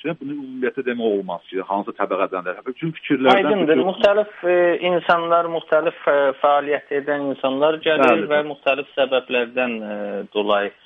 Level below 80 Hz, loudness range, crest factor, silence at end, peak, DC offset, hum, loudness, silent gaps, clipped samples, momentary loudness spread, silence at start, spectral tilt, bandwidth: -64 dBFS; 3 LU; 18 dB; 0.15 s; 0 dBFS; under 0.1%; none; -20 LUFS; none; under 0.1%; 11 LU; 0.05 s; -6.5 dB/octave; 7.2 kHz